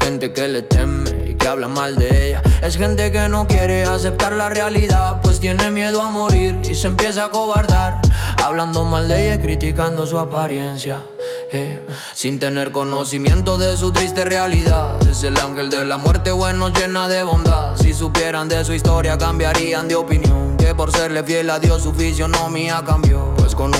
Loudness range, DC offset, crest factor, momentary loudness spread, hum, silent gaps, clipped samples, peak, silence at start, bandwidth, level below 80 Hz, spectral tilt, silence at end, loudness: 3 LU; under 0.1%; 12 dB; 5 LU; none; none; under 0.1%; -4 dBFS; 0 s; 16 kHz; -22 dBFS; -5 dB/octave; 0 s; -17 LUFS